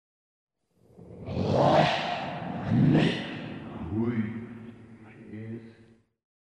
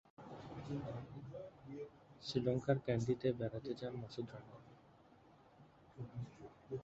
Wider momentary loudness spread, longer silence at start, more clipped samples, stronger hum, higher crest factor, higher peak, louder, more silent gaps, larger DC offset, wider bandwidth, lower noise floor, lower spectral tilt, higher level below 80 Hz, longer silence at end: first, 22 LU vs 19 LU; first, 1 s vs 0.2 s; neither; neither; about the same, 20 dB vs 24 dB; first, -10 dBFS vs -20 dBFS; first, -27 LUFS vs -43 LUFS; neither; neither; first, 9.6 kHz vs 8 kHz; about the same, -63 dBFS vs -66 dBFS; about the same, -7.5 dB/octave vs -6.5 dB/octave; first, -56 dBFS vs -68 dBFS; first, 0.85 s vs 0 s